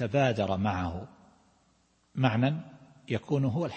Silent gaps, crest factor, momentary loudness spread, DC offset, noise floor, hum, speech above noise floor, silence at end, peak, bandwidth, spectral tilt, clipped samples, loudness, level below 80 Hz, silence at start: none; 20 dB; 16 LU; under 0.1%; -68 dBFS; none; 40 dB; 0 s; -10 dBFS; 8.4 kHz; -7.5 dB/octave; under 0.1%; -29 LUFS; -58 dBFS; 0 s